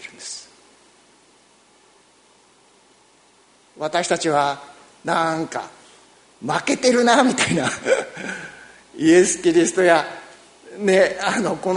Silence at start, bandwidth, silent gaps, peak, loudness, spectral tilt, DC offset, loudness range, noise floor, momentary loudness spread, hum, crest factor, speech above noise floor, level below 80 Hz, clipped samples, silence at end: 0 s; 11 kHz; none; 0 dBFS; -19 LUFS; -3.5 dB/octave; under 0.1%; 8 LU; -55 dBFS; 18 LU; none; 22 dB; 37 dB; -62 dBFS; under 0.1%; 0 s